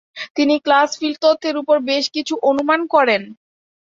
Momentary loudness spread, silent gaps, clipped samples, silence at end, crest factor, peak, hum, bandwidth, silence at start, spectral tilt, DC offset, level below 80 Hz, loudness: 6 LU; 0.30-0.35 s; under 0.1%; 0.55 s; 16 dB; -2 dBFS; none; 7.6 kHz; 0.15 s; -3 dB/octave; under 0.1%; -66 dBFS; -17 LUFS